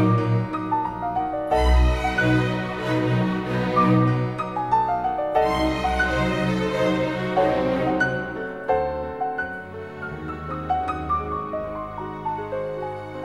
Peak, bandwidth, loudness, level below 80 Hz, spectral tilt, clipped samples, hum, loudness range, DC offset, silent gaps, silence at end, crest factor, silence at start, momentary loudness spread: -8 dBFS; 12.5 kHz; -23 LUFS; -32 dBFS; -7 dB/octave; under 0.1%; none; 7 LU; 0.2%; none; 0 s; 16 dB; 0 s; 11 LU